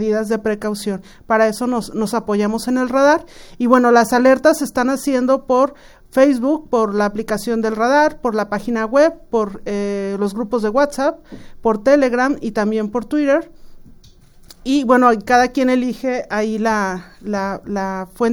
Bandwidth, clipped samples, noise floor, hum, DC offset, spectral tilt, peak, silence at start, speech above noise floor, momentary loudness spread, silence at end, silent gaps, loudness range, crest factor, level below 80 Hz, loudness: over 20 kHz; under 0.1%; -45 dBFS; none; under 0.1%; -5 dB/octave; 0 dBFS; 0 s; 28 dB; 10 LU; 0 s; none; 4 LU; 16 dB; -46 dBFS; -17 LUFS